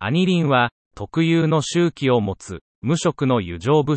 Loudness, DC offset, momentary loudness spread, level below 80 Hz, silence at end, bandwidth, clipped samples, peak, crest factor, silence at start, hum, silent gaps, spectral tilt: -20 LUFS; under 0.1%; 11 LU; -54 dBFS; 0 s; 8.8 kHz; under 0.1%; -4 dBFS; 14 dB; 0 s; none; 0.71-0.91 s, 2.61-2.82 s; -6 dB/octave